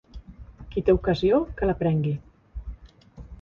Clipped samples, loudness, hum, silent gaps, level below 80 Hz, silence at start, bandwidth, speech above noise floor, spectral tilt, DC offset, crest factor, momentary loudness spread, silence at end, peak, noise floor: under 0.1%; -24 LUFS; none; none; -40 dBFS; 0.15 s; 7 kHz; 24 dB; -9 dB/octave; under 0.1%; 18 dB; 23 LU; 0.05 s; -8 dBFS; -46 dBFS